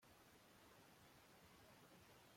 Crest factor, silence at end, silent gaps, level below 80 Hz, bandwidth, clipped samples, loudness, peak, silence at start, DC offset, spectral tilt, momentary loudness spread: 12 dB; 0 s; none; -86 dBFS; 16.5 kHz; under 0.1%; -68 LUFS; -56 dBFS; 0 s; under 0.1%; -3.5 dB/octave; 1 LU